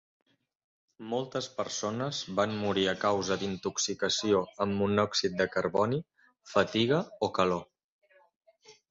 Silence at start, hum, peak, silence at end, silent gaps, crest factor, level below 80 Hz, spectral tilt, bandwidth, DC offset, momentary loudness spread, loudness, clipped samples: 1 s; none; -10 dBFS; 0.2 s; 7.84-7.99 s, 8.36-8.41 s; 22 dB; -62 dBFS; -4 dB/octave; 8 kHz; under 0.1%; 7 LU; -30 LUFS; under 0.1%